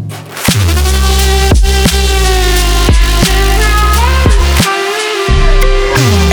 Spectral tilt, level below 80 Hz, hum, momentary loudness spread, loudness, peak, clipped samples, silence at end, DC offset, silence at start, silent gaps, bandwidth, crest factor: -4 dB/octave; -10 dBFS; none; 3 LU; -10 LUFS; 0 dBFS; under 0.1%; 0 s; under 0.1%; 0 s; none; over 20 kHz; 8 dB